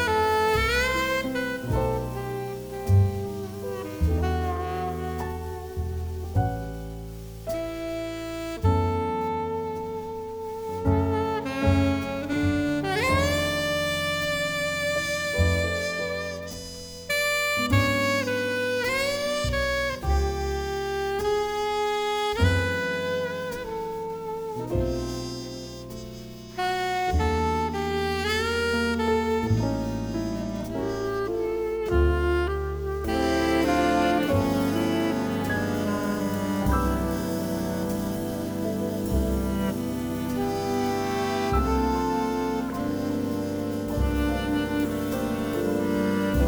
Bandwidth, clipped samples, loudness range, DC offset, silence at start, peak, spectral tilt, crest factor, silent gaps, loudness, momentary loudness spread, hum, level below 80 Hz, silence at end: over 20 kHz; under 0.1%; 5 LU; under 0.1%; 0 s; -8 dBFS; -5.5 dB/octave; 18 dB; none; -26 LUFS; 10 LU; none; -36 dBFS; 0 s